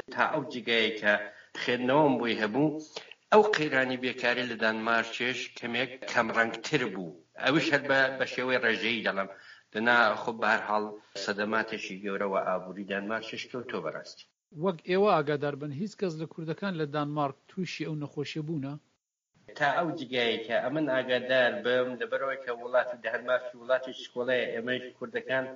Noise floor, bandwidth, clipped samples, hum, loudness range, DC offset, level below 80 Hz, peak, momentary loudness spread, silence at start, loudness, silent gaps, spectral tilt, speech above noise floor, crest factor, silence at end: -73 dBFS; 7.4 kHz; under 0.1%; none; 6 LU; under 0.1%; -76 dBFS; -8 dBFS; 11 LU; 0.1 s; -29 LUFS; none; -2.5 dB/octave; 44 dB; 22 dB; 0 s